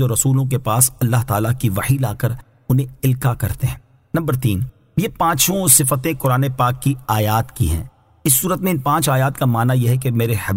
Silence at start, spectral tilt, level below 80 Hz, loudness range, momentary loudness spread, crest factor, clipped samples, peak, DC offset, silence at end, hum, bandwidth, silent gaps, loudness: 0 s; -5 dB/octave; -38 dBFS; 4 LU; 9 LU; 18 dB; under 0.1%; 0 dBFS; under 0.1%; 0 s; none; 16.5 kHz; none; -17 LUFS